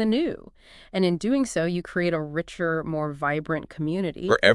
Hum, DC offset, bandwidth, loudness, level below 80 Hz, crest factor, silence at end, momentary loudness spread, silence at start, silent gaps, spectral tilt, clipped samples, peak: none; under 0.1%; 12 kHz; -26 LUFS; -54 dBFS; 24 dB; 0 s; 6 LU; 0 s; none; -5.5 dB/octave; under 0.1%; -2 dBFS